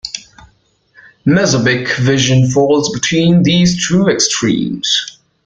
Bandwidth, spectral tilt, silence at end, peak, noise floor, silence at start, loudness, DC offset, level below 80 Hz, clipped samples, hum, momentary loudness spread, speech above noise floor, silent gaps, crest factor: 9.2 kHz; -4.5 dB/octave; 0.35 s; 0 dBFS; -54 dBFS; 0.05 s; -12 LUFS; under 0.1%; -44 dBFS; under 0.1%; none; 5 LU; 42 dB; none; 12 dB